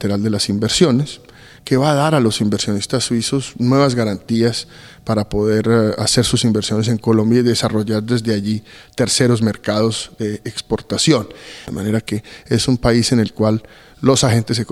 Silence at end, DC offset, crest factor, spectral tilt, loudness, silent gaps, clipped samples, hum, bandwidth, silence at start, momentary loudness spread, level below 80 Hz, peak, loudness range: 0 s; under 0.1%; 16 dB; -5 dB/octave; -17 LUFS; none; under 0.1%; none; 13.5 kHz; 0 s; 10 LU; -42 dBFS; 0 dBFS; 3 LU